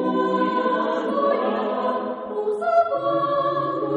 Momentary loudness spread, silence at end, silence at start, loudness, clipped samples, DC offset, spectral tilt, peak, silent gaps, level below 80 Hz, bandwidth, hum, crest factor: 5 LU; 0 s; 0 s; -22 LUFS; under 0.1%; under 0.1%; -7 dB/octave; -8 dBFS; none; -68 dBFS; 9.8 kHz; none; 14 dB